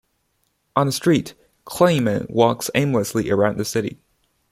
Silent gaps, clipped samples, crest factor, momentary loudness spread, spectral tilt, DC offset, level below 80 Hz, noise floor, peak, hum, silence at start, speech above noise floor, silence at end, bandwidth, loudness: none; under 0.1%; 20 dB; 8 LU; -5.5 dB/octave; under 0.1%; -54 dBFS; -69 dBFS; -2 dBFS; none; 0.75 s; 50 dB; 0.55 s; 16 kHz; -20 LUFS